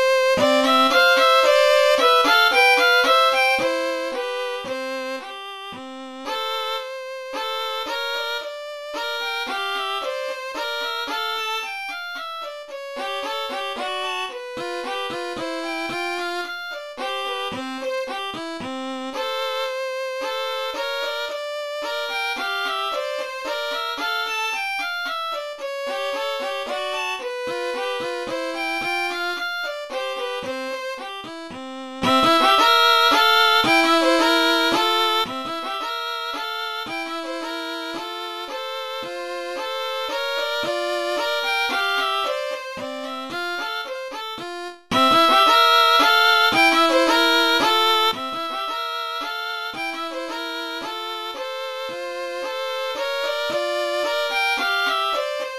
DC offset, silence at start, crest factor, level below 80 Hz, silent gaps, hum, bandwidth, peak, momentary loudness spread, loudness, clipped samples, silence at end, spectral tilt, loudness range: under 0.1%; 0 s; 18 dB; -62 dBFS; none; none; 14 kHz; -4 dBFS; 15 LU; -21 LUFS; under 0.1%; 0 s; -2 dB/octave; 12 LU